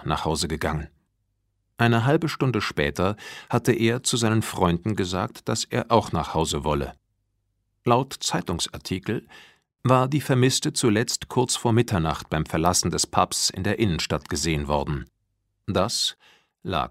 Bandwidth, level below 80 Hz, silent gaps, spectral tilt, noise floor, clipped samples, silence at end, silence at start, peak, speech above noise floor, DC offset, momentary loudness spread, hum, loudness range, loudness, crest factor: 16 kHz; -44 dBFS; none; -4.5 dB/octave; -74 dBFS; under 0.1%; 0 s; 0 s; -2 dBFS; 50 dB; under 0.1%; 8 LU; none; 4 LU; -24 LUFS; 22 dB